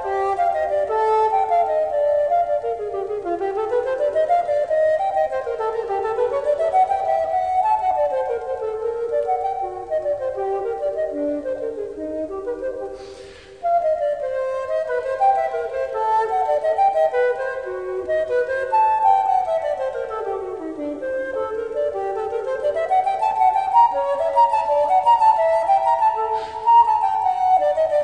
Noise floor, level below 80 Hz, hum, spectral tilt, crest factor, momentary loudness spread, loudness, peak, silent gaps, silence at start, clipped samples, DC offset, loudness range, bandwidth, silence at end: -40 dBFS; -54 dBFS; none; -5 dB/octave; 16 dB; 10 LU; -20 LUFS; -4 dBFS; none; 0 s; under 0.1%; 0.1%; 8 LU; 10 kHz; 0 s